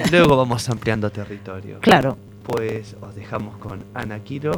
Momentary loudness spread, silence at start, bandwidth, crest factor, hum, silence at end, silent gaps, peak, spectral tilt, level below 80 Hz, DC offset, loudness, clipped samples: 19 LU; 0 s; 19 kHz; 20 dB; none; 0 s; none; 0 dBFS; -5.5 dB/octave; -46 dBFS; under 0.1%; -20 LUFS; under 0.1%